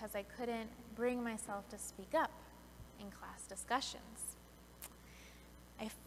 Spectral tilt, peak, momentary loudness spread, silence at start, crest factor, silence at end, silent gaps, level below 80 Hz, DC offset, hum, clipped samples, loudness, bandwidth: -3 dB/octave; -22 dBFS; 19 LU; 0 s; 22 dB; 0 s; none; -64 dBFS; under 0.1%; 60 Hz at -65 dBFS; under 0.1%; -43 LUFS; 16 kHz